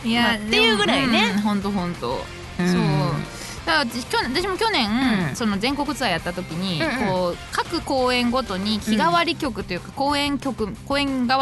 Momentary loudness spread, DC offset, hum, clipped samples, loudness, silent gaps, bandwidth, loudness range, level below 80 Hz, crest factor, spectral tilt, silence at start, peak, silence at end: 9 LU; under 0.1%; none; under 0.1%; -21 LUFS; none; 12 kHz; 2 LU; -42 dBFS; 16 dB; -4.5 dB/octave; 0 s; -6 dBFS; 0 s